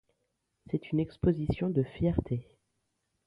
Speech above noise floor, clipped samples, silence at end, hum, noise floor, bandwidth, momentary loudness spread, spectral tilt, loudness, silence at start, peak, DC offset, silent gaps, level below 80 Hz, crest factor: 50 dB; under 0.1%; 0.85 s; none; -80 dBFS; 5.4 kHz; 8 LU; -10.5 dB/octave; -32 LUFS; 0.7 s; -14 dBFS; under 0.1%; none; -48 dBFS; 18 dB